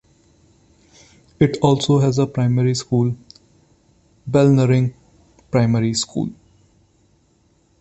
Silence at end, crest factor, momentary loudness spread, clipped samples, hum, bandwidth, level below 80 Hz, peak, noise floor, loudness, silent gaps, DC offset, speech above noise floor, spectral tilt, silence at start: 1.5 s; 18 dB; 10 LU; under 0.1%; none; 8.4 kHz; -50 dBFS; -2 dBFS; -59 dBFS; -18 LUFS; none; under 0.1%; 43 dB; -6.5 dB/octave; 1.4 s